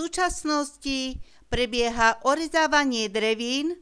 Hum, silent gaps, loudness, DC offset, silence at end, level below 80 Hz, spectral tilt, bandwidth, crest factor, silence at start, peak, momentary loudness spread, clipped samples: none; none; -24 LUFS; under 0.1%; 0.05 s; -44 dBFS; -2.5 dB/octave; 11 kHz; 18 dB; 0 s; -6 dBFS; 8 LU; under 0.1%